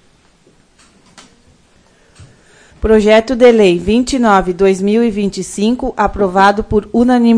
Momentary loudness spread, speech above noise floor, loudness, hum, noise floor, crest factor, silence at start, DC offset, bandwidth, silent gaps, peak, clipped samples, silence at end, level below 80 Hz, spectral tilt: 8 LU; 39 dB; -12 LUFS; none; -50 dBFS; 12 dB; 2.2 s; under 0.1%; 10.5 kHz; none; 0 dBFS; 0.3%; 0 s; -34 dBFS; -5.5 dB/octave